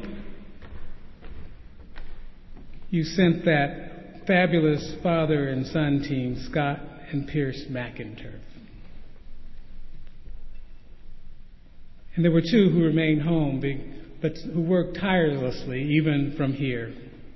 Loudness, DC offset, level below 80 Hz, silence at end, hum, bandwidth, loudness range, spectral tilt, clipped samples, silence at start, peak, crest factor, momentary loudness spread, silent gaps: -25 LUFS; under 0.1%; -44 dBFS; 0 s; none; 6 kHz; 11 LU; -8 dB/octave; under 0.1%; 0 s; -6 dBFS; 20 dB; 25 LU; none